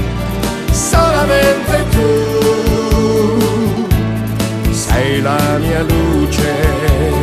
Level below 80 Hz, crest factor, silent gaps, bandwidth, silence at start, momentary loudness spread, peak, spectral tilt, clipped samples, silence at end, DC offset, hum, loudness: -20 dBFS; 12 dB; none; 14 kHz; 0 s; 5 LU; 0 dBFS; -5.5 dB/octave; under 0.1%; 0 s; under 0.1%; none; -13 LUFS